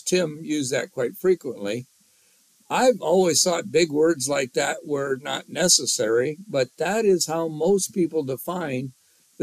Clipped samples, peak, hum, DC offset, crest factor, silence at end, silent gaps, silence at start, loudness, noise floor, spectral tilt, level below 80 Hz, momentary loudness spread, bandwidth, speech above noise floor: under 0.1%; -4 dBFS; none; under 0.1%; 20 dB; 0 s; none; 0.05 s; -23 LUFS; -60 dBFS; -3 dB/octave; -66 dBFS; 11 LU; 15.5 kHz; 37 dB